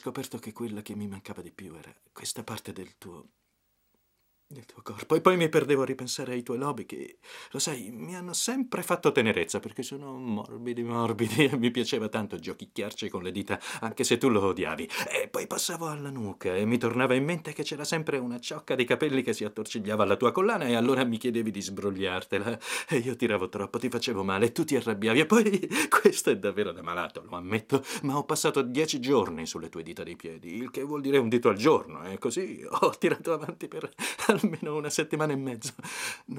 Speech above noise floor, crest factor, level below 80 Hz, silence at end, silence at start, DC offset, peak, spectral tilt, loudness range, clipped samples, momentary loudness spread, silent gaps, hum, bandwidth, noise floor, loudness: 45 dB; 26 dB; -70 dBFS; 0 s; 0.05 s; under 0.1%; -4 dBFS; -4.5 dB/octave; 5 LU; under 0.1%; 14 LU; none; none; 16 kHz; -73 dBFS; -28 LUFS